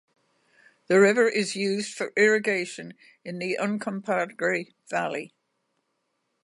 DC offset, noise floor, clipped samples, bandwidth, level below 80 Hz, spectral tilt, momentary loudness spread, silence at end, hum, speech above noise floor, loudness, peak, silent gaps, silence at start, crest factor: under 0.1%; -76 dBFS; under 0.1%; 11.5 kHz; -80 dBFS; -4.5 dB/octave; 17 LU; 1.15 s; none; 51 dB; -25 LUFS; -8 dBFS; none; 0.9 s; 20 dB